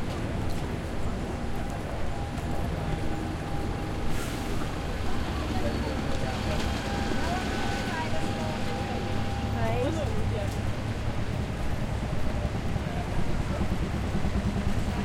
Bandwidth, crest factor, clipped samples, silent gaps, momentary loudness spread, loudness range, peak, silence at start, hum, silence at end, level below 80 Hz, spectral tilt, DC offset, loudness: 15.5 kHz; 14 dB; under 0.1%; none; 4 LU; 3 LU; -14 dBFS; 0 s; none; 0 s; -34 dBFS; -6 dB/octave; under 0.1%; -31 LUFS